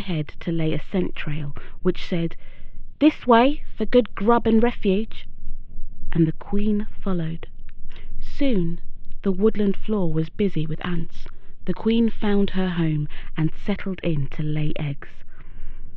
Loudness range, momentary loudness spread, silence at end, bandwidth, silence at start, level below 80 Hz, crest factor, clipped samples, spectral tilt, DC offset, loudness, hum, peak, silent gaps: 6 LU; 20 LU; 0 s; 4.4 kHz; 0 s; -28 dBFS; 16 dB; under 0.1%; -9 dB/octave; under 0.1%; -23 LUFS; none; -2 dBFS; none